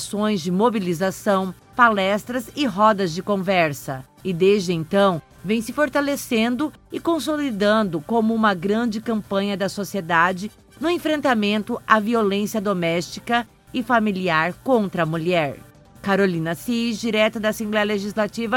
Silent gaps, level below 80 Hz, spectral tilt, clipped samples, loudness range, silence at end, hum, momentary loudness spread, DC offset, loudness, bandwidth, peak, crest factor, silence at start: none; -54 dBFS; -5.5 dB/octave; under 0.1%; 2 LU; 0 s; none; 8 LU; under 0.1%; -21 LUFS; 17 kHz; 0 dBFS; 20 dB; 0 s